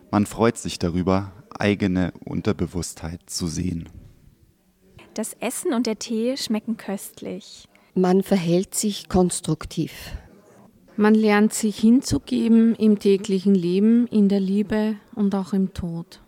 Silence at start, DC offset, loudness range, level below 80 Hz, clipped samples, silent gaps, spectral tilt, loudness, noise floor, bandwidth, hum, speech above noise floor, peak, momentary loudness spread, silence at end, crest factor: 0.1 s; under 0.1%; 9 LU; -46 dBFS; under 0.1%; none; -5.5 dB/octave; -22 LUFS; -59 dBFS; 16.5 kHz; none; 38 dB; -4 dBFS; 14 LU; 0.15 s; 18 dB